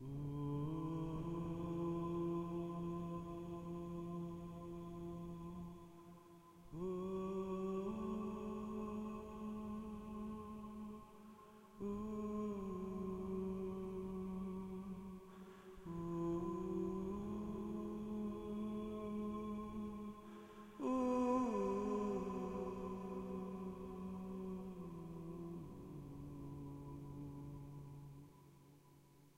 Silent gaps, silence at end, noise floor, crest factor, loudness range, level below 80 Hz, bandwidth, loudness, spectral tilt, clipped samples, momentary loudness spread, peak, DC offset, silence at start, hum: none; 0.05 s; -66 dBFS; 20 dB; 9 LU; -62 dBFS; 16 kHz; -46 LUFS; -8.5 dB/octave; under 0.1%; 14 LU; -26 dBFS; under 0.1%; 0 s; none